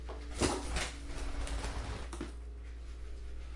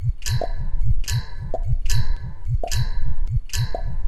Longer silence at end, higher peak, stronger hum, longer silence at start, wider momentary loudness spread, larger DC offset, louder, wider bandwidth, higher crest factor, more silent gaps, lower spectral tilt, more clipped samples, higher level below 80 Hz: about the same, 0 s vs 0 s; second, -18 dBFS vs -2 dBFS; neither; about the same, 0 s vs 0 s; first, 14 LU vs 6 LU; neither; second, -40 LUFS vs -27 LUFS; second, 11.5 kHz vs 13 kHz; first, 22 dB vs 16 dB; neither; about the same, -4 dB/octave vs -4.5 dB/octave; neither; second, -42 dBFS vs -24 dBFS